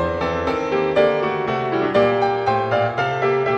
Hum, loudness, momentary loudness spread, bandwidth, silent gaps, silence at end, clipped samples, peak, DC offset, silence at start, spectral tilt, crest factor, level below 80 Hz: none; -19 LUFS; 4 LU; 8 kHz; none; 0 s; under 0.1%; -4 dBFS; under 0.1%; 0 s; -6.5 dB/octave; 16 dB; -46 dBFS